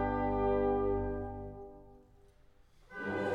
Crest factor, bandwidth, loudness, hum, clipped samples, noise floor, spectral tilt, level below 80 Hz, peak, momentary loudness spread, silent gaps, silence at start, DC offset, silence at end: 14 dB; 5.4 kHz; -34 LUFS; none; under 0.1%; -63 dBFS; -8.5 dB/octave; -48 dBFS; -20 dBFS; 19 LU; none; 0 s; under 0.1%; 0 s